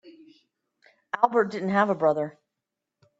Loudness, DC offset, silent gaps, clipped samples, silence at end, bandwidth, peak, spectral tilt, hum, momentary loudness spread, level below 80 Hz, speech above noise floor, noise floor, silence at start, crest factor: -25 LUFS; under 0.1%; none; under 0.1%; 0.9 s; 7.8 kHz; -4 dBFS; -7.5 dB/octave; none; 11 LU; -74 dBFS; 62 dB; -85 dBFS; 0.05 s; 24 dB